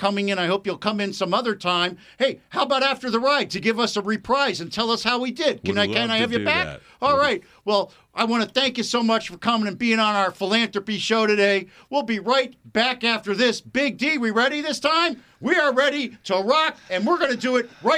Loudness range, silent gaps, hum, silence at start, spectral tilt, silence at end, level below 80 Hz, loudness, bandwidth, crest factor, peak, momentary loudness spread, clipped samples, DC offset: 1 LU; none; none; 0 s; -4 dB/octave; 0 s; -60 dBFS; -22 LUFS; 14.5 kHz; 18 dB; -6 dBFS; 6 LU; under 0.1%; under 0.1%